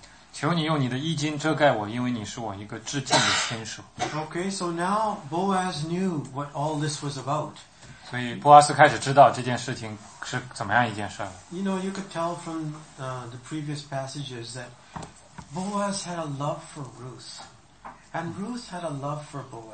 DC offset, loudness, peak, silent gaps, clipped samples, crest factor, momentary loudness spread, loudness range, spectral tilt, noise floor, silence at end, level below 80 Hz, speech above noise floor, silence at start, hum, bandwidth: under 0.1%; -25 LUFS; -2 dBFS; none; under 0.1%; 26 dB; 20 LU; 13 LU; -4.5 dB/octave; -47 dBFS; 0 s; -62 dBFS; 21 dB; 0 s; none; 8.8 kHz